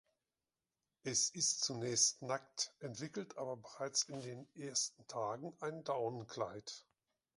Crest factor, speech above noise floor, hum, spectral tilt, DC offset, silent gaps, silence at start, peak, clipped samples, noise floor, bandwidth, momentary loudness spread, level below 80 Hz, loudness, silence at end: 24 dB; over 49 dB; none; -2 dB/octave; under 0.1%; none; 1.05 s; -18 dBFS; under 0.1%; under -90 dBFS; 11.5 kHz; 15 LU; -82 dBFS; -39 LUFS; 0.55 s